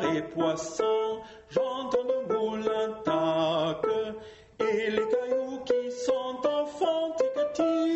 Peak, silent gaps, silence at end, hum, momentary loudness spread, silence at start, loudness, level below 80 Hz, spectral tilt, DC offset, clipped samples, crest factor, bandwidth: -12 dBFS; none; 0 s; none; 5 LU; 0 s; -29 LUFS; -66 dBFS; -5 dB/octave; under 0.1%; under 0.1%; 16 dB; 8.2 kHz